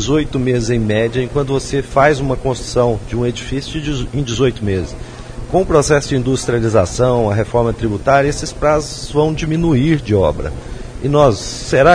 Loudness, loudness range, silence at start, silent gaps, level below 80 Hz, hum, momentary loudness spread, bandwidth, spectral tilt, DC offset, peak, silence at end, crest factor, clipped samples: -16 LUFS; 3 LU; 0 s; none; -30 dBFS; none; 9 LU; 10.5 kHz; -6 dB/octave; under 0.1%; 0 dBFS; 0 s; 14 dB; under 0.1%